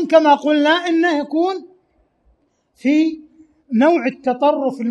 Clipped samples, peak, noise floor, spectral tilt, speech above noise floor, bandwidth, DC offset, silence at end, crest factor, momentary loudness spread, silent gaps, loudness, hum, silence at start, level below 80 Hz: under 0.1%; 0 dBFS; -61 dBFS; -5 dB/octave; 45 dB; 9.2 kHz; under 0.1%; 0 s; 16 dB; 9 LU; none; -16 LUFS; none; 0 s; -66 dBFS